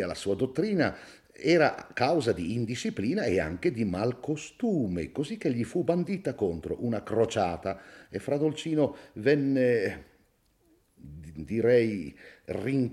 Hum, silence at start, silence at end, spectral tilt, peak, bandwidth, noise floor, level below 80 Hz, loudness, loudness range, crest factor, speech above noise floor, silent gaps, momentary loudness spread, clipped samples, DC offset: none; 0 s; 0 s; -6.5 dB/octave; -10 dBFS; 13 kHz; -67 dBFS; -60 dBFS; -29 LUFS; 2 LU; 18 dB; 39 dB; none; 13 LU; under 0.1%; under 0.1%